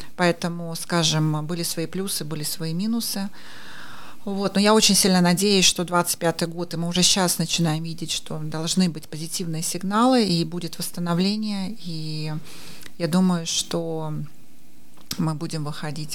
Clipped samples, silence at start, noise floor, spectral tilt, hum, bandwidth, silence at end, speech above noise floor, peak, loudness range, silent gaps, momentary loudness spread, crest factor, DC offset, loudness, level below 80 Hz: under 0.1%; 0 s; -54 dBFS; -4 dB/octave; none; 17.5 kHz; 0 s; 31 dB; -2 dBFS; 7 LU; none; 16 LU; 22 dB; 2%; -22 LUFS; -54 dBFS